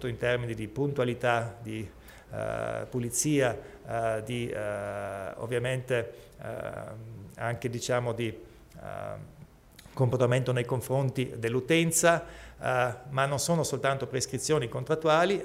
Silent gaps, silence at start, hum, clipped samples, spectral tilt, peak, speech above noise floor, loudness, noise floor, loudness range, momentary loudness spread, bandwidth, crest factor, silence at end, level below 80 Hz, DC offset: none; 0 s; none; under 0.1%; -4.5 dB/octave; -10 dBFS; 24 dB; -30 LUFS; -53 dBFS; 7 LU; 16 LU; 16 kHz; 20 dB; 0 s; -56 dBFS; under 0.1%